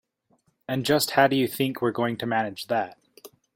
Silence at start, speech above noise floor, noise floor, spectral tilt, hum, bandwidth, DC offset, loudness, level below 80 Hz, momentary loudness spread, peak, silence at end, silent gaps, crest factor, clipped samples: 0.7 s; 44 dB; -68 dBFS; -4.5 dB/octave; none; 16.5 kHz; under 0.1%; -25 LUFS; -66 dBFS; 10 LU; -4 dBFS; 0.3 s; none; 22 dB; under 0.1%